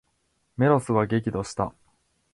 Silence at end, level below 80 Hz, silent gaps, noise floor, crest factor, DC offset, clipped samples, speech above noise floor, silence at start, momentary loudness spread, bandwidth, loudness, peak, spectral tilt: 0.65 s; -54 dBFS; none; -71 dBFS; 20 dB; under 0.1%; under 0.1%; 48 dB; 0.6 s; 10 LU; 11.5 kHz; -25 LUFS; -6 dBFS; -7 dB/octave